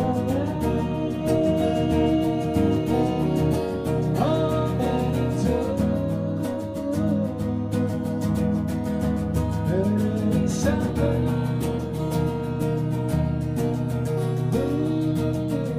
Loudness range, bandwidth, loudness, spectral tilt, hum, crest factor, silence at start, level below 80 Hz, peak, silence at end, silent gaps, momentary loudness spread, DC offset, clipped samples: 3 LU; 15.5 kHz; -24 LUFS; -7.5 dB/octave; none; 14 dB; 0 s; -38 dBFS; -8 dBFS; 0 s; none; 4 LU; under 0.1%; under 0.1%